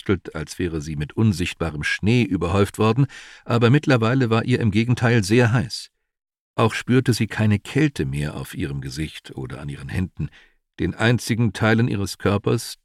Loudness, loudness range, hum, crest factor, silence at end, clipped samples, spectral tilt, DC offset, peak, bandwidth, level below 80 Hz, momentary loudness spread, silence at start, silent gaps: -21 LUFS; 6 LU; none; 16 dB; 0.1 s; under 0.1%; -6.5 dB/octave; under 0.1%; -4 dBFS; 14 kHz; -44 dBFS; 13 LU; 0.05 s; 6.40-6.54 s